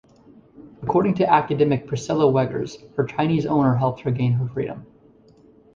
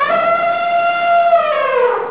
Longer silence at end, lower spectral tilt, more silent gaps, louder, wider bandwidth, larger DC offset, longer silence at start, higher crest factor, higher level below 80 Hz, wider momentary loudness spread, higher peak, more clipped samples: first, 0.9 s vs 0 s; first, -8 dB/octave vs -6.5 dB/octave; neither; second, -21 LUFS vs -14 LUFS; first, 7.6 kHz vs 4 kHz; second, under 0.1% vs 0.4%; first, 0.6 s vs 0 s; first, 18 dB vs 12 dB; first, -54 dBFS vs -64 dBFS; first, 11 LU vs 3 LU; about the same, -4 dBFS vs -2 dBFS; neither